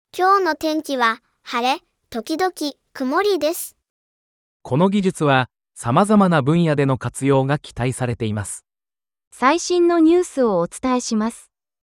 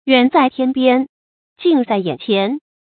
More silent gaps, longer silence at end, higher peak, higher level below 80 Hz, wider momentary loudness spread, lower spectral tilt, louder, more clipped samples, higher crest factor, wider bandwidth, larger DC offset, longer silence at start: first, 3.90-4.60 s, 9.27-9.31 s vs 1.09-1.56 s; first, 0.6 s vs 0.2 s; about the same, -2 dBFS vs 0 dBFS; first, -54 dBFS vs -64 dBFS; first, 13 LU vs 8 LU; second, -5.5 dB/octave vs -10 dB/octave; second, -19 LUFS vs -16 LUFS; neither; about the same, 18 dB vs 16 dB; first, over 20 kHz vs 4.6 kHz; neither; about the same, 0.15 s vs 0.05 s